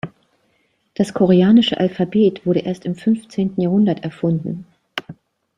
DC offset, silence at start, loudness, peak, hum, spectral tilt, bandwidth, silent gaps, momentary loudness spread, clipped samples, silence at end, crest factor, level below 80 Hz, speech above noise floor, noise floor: under 0.1%; 0.05 s; -17 LUFS; -2 dBFS; none; -7.5 dB/octave; 10.5 kHz; none; 17 LU; under 0.1%; 0.45 s; 16 dB; -58 dBFS; 48 dB; -64 dBFS